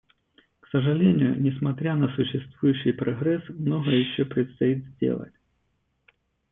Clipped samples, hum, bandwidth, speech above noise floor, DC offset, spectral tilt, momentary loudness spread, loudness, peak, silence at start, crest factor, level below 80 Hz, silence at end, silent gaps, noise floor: under 0.1%; none; 3.9 kHz; 49 dB; under 0.1%; -11.5 dB/octave; 7 LU; -25 LUFS; -8 dBFS; 0.75 s; 16 dB; -62 dBFS; 1.25 s; none; -73 dBFS